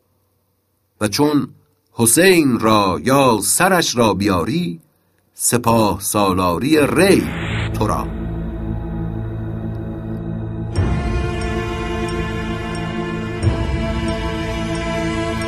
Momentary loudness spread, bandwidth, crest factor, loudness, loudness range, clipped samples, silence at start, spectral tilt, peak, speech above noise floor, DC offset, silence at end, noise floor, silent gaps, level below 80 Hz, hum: 12 LU; 15.5 kHz; 18 dB; -18 LUFS; 9 LU; under 0.1%; 1 s; -4.5 dB/octave; 0 dBFS; 50 dB; under 0.1%; 0 s; -65 dBFS; none; -32 dBFS; none